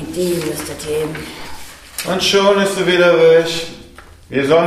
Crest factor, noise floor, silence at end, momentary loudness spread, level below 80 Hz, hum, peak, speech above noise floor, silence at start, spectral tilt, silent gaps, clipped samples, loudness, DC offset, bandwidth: 14 dB; -40 dBFS; 0 s; 19 LU; -44 dBFS; none; -2 dBFS; 25 dB; 0 s; -4 dB/octave; none; under 0.1%; -15 LUFS; under 0.1%; 15.5 kHz